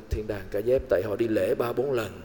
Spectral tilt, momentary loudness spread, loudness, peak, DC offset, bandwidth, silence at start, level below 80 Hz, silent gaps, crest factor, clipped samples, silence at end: -7 dB/octave; 7 LU; -27 LUFS; -12 dBFS; 0.2%; 18 kHz; 0 s; -42 dBFS; none; 14 dB; under 0.1%; 0 s